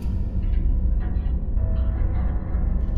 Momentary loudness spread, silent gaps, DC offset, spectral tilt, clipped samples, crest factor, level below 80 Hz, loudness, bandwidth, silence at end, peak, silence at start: 2 LU; none; under 0.1%; -10.5 dB/octave; under 0.1%; 10 dB; -22 dBFS; -26 LUFS; 3.2 kHz; 0 s; -10 dBFS; 0 s